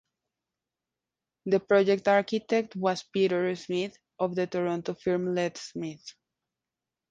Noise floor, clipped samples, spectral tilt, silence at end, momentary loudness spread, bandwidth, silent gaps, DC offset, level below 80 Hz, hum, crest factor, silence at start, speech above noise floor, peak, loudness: -89 dBFS; under 0.1%; -6 dB/octave; 1 s; 14 LU; 7.8 kHz; none; under 0.1%; -72 dBFS; none; 18 dB; 1.45 s; 62 dB; -10 dBFS; -28 LUFS